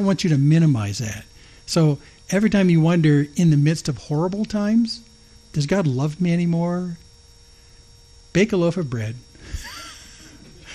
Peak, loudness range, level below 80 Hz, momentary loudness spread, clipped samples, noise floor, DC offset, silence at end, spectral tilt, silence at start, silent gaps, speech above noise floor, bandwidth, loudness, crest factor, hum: -6 dBFS; 7 LU; -46 dBFS; 18 LU; under 0.1%; -49 dBFS; under 0.1%; 0 s; -6.5 dB/octave; 0 s; none; 30 dB; 13 kHz; -20 LUFS; 14 dB; none